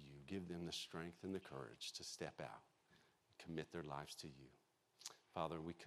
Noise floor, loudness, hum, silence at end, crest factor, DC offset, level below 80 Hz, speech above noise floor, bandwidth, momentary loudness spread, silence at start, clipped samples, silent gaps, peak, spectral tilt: -75 dBFS; -51 LUFS; none; 0 s; 24 dB; under 0.1%; -80 dBFS; 24 dB; 14.5 kHz; 11 LU; 0 s; under 0.1%; none; -28 dBFS; -4 dB/octave